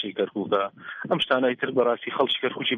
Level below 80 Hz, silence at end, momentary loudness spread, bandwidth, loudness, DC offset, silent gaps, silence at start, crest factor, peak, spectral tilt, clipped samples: -68 dBFS; 0 s; 6 LU; 10 kHz; -25 LUFS; under 0.1%; none; 0 s; 18 dB; -8 dBFS; -6 dB/octave; under 0.1%